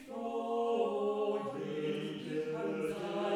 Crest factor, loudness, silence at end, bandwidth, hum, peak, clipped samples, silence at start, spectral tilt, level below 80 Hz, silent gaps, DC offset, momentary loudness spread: 14 dB; -36 LUFS; 0 s; 14 kHz; none; -20 dBFS; under 0.1%; 0 s; -6.5 dB/octave; -76 dBFS; none; under 0.1%; 6 LU